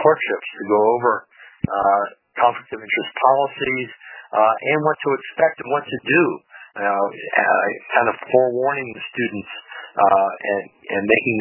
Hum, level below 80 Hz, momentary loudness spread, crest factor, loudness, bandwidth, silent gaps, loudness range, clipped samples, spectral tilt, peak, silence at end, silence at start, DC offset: none; -60 dBFS; 11 LU; 20 dB; -20 LUFS; 3.1 kHz; none; 1 LU; under 0.1%; -9.5 dB/octave; 0 dBFS; 0 s; 0 s; under 0.1%